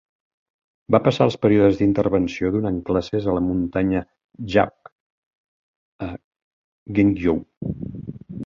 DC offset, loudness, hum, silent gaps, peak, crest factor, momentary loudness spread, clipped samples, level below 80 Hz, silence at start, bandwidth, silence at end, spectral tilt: under 0.1%; -21 LUFS; none; 4.24-4.29 s, 4.92-5.99 s, 6.24-6.86 s, 7.57-7.61 s; -2 dBFS; 20 dB; 16 LU; under 0.1%; -44 dBFS; 0.9 s; 7.4 kHz; 0 s; -8 dB/octave